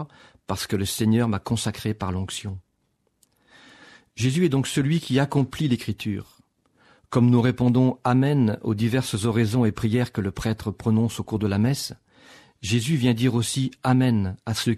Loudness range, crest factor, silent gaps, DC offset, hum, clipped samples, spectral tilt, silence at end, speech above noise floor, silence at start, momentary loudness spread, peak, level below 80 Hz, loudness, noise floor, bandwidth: 5 LU; 16 dB; none; under 0.1%; none; under 0.1%; -6 dB/octave; 0 s; 48 dB; 0 s; 10 LU; -6 dBFS; -52 dBFS; -23 LUFS; -71 dBFS; 13.5 kHz